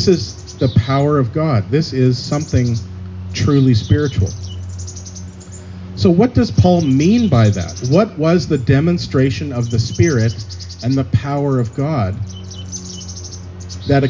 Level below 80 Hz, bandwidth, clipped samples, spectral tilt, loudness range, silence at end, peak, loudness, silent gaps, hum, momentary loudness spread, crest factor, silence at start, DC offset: -32 dBFS; 7.6 kHz; under 0.1%; -7 dB/octave; 5 LU; 0 s; -2 dBFS; -16 LUFS; none; none; 17 LU; 14 dB; 0 s; under 0.1%